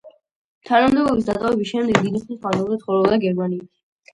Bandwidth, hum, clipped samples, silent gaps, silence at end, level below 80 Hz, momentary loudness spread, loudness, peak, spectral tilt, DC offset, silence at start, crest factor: 11.5 kHz; none; under 0.1%; 0.31-0.61 s; 0.5 s; -52 dBFS; 8 LU; -20 LUFS; 0 dBFS; -6.5 dB/octave; under 0.1%; 0.05 s; 20 dB